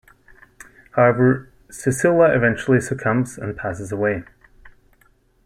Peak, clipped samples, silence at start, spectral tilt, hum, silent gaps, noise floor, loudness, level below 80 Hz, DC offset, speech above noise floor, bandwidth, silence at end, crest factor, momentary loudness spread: -4 dBFS; under 0.1%; 0.95 s; -7 dB/octave; none; none; -58 dBFS; -19 LUFS; -50 dBFS; under 0.1%; 40 dB; 13.5 kHz; 0.75 s; 18 dB; 12 LU